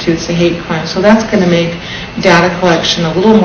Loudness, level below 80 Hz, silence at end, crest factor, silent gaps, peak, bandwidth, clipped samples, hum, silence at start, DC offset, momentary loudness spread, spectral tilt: -11 LUFS; -36 dBFS; 0 s; 10 dB; none; 0 dBFS; 8 kHz; 0.7%; none; 0 s; under 0.1%; 8 LU; -5.5 dB/octave